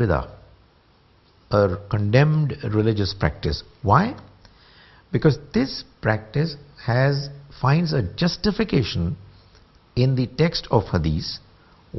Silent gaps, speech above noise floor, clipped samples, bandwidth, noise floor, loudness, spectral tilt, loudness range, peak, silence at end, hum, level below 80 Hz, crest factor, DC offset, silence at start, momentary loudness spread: none; 35 dB; under 0.1%; 6.2 kHz; -57 dBFS; -22 LUFS; -7.5 dB/octave; 2 LU; -2 dBFS; 0 s; none; -42 dBFS; 22 dB; under 0.1%; 0 s; 9 LU